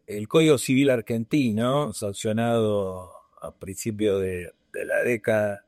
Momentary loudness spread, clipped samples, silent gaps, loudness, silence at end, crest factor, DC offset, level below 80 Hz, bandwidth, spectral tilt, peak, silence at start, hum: 16 LU; under 0.1%; none; -24 LUFS; 0.1 s; 16 dB; under 0.1%; -60 dBFS; 15 kHz; -5.5 dB/octave; -8 dBFS; 0.1 s; none